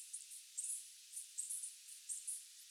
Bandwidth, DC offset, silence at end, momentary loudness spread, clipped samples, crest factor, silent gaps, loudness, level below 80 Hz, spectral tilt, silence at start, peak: over 20 kHz; under 0.1%; 0 s; 7 LU; under 0.1%; 20 dB; none; -46 LUFS; under -90 dBFS; 9 dB/octave; 0 s; -28 dBFS